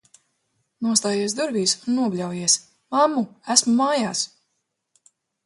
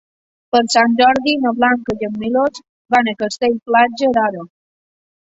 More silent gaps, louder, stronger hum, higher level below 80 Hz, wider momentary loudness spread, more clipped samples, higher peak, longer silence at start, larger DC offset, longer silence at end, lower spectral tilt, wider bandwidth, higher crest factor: second, none vs 2.69-2.85 s; second, -21 LUFS vs -16 LUFS; neither; second, -72 dBFS vs -56 dBFS; about the same, 8 LU vs 8 LU; neither; about the same, 0 dBFS vs 0 dBFS; first, 0.8 s vs 0.55 s; neither; first, 1.2 s vs 0.8 s; about the same, -2.5 dB/octave vs -3.5 dB/octave; first, 11.5 kHz vs 8 kHz; first, 22 dB vs 16 dB